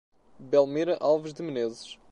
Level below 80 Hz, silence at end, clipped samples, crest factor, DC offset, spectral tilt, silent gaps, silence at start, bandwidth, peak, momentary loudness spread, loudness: -70 dBFS; 0.2 s; under 0.1%; 18 dB; under 0.1%; -6 dB/octave; none; 0.4 s; 10.5 kHz; -10 dBFS; 10 LU; -27 LUFS